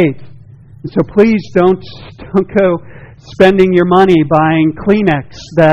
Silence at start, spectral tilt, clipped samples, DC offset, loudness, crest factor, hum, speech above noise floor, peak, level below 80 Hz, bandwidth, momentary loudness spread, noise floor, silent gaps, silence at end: 0 s; -8 dB/octave; 1%; under 0.1%; -11 LUFS; 12 dB; none; 25 dB; 0 dBFS; -40 dBFS; 7.6 kHz; 11 LU; -36 dBFS; none; 0 s